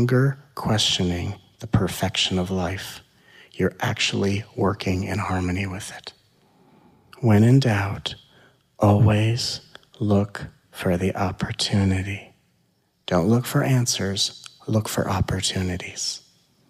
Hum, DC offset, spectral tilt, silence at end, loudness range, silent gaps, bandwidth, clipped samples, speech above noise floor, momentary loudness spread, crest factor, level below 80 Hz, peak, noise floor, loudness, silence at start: none; under 0.1%; -5 dB/octave; 0.5 s; 4 LU; none; 15.5 kHz; under 0.1%; 44 dB; 15 LU; 18 dB; -48 dBFS; -6 dBFS; -66 dBFS; -23 LUFS; 0 s